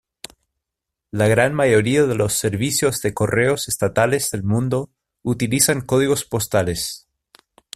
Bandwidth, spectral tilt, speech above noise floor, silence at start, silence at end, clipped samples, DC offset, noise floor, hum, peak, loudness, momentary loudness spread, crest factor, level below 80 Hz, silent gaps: 16 kHz; -4.5 dB/octave; 64 dB; 1.15 s; 0.8 s; under 0.1%; under 0.1%; -83 dBFS; none; -2 dBFS; -19 LUFS; 13 LU; 18 dB; -50 dBFS; none